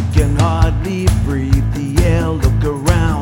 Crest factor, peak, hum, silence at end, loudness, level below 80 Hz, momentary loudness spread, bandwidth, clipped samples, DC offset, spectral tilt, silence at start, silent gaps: 14 dB; 0 dBFS; none; 0 s; -15 LUFS; -18 dBFS; 3 LU; 16.5 kHz; under 0.1%; under 0.1%; -6.5 dB/octave; 0 s; none